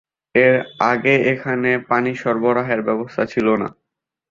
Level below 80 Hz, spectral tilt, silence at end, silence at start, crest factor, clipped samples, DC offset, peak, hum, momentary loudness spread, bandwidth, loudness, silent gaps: -58 dBFS; -7 dB/octave; 0.6 s; 0.35 s; 18 dB; under 0.1%; under 0.1%; -2 dBFS; none; 7 LU; 7.4 kHz; -18 LUFS; none